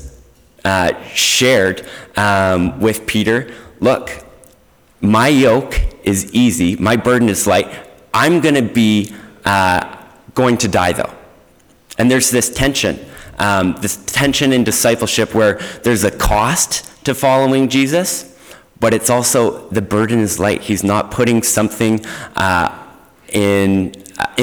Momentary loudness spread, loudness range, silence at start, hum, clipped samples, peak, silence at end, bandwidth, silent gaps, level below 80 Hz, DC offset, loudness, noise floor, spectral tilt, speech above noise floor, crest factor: 9 LU; 2 LU; 0 s; none; under 0.1%; -4 dBFS; 0 s; over 20 kHz; none; -34 dBFS; under 0.1%; -14 LUFS; -50 dBFS; -4 dB/octave; 36 dB; 12 dB